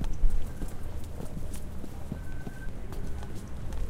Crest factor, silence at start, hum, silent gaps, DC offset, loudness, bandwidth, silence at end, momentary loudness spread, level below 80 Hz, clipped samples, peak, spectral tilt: 18 dB; 0 s; none; none; 0.3%; -40 LUFS; 13 kHz; 0 s; 7 LU; -32 dBFS; under 0.1%; -10 dBFS; -6.5 dB/octave